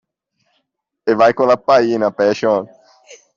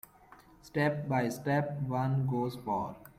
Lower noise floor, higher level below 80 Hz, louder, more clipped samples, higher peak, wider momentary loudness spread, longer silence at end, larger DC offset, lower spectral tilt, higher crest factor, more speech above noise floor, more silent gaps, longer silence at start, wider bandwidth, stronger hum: first, -72 dBFS vs -58 dBFS; about the same, -60 dBFS vs -64 dBFS; first, -15 LUFS vs -33 LUFS; neither; first, -2 dBFS vs -16 dBFS; first, 8 LU vs 4 LU; about the same, 0.2 s vs 0.1 s; neither; second, -5.5 dB/octave vs -7.5 dB/octave; about the same, 14 dB vs 16 dB; first, 58 dB vs 26 dB; neither; first, 1.05 s vs 0.3 s; second, 7.4 kHz vs 16 kHz; neither